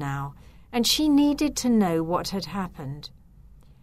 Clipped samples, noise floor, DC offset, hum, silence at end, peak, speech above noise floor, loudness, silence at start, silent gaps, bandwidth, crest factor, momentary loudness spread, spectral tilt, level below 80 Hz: under 0.1%; -50 dBFS; under 0.1%; none; 0.75 s; -10 dBFS; 27 dB; -24 LUFS; 0 s; none; 16 kHz; 16 dB; 17 LU; -4.5 dB/octave; -48 dBFS